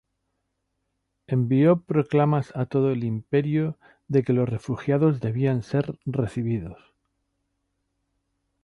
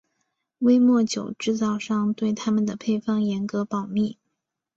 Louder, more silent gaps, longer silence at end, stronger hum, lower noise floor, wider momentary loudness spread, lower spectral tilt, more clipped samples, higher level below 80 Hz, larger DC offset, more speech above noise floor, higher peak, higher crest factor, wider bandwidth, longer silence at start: about the same, -24 LUFS vs -24 LUFS; neither; first, 1.9 s vs 0.65 s; neither; about the same, -77 dBFS vs -80 dBFS; about the same, 9 LU vs 9 LU; first, -9.5 dB/octave vs -6 dB/octave; neither; first, -56 dBFS vs -64 dBFS; neither; second, 54 dB vs 58 dB; about the same, -8 dBFS vs -8 dBFS; about the same, 16 dB vs 14 dB; second, 7 kHz vs 7.8 kHz; first, 1.3 s vs 0.6 s